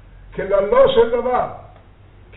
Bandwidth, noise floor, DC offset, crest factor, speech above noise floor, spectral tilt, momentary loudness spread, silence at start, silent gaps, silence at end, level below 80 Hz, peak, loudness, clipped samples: 4.1 kHz; -45 dBFS; under 0.1%; 18 dB; 29 dB; -3 dB/octave; 15 LU; 0.3 s; none; 0.7 s; -40 dBFS; 0 dBFS; -17 LUFS; under 0.1%